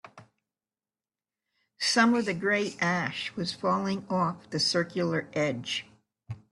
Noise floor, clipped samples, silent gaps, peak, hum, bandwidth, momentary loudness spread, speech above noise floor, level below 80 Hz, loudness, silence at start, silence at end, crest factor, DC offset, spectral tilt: under -90 dBFS; under 0.1%; none; -8 dBFS; none; 12 kHz; 9 LU; over 62 dB; -70 dBFS; -28 LUFS; 0.05 s; 0.15 s; 22 dB; under 0.1%; -4 dB/octave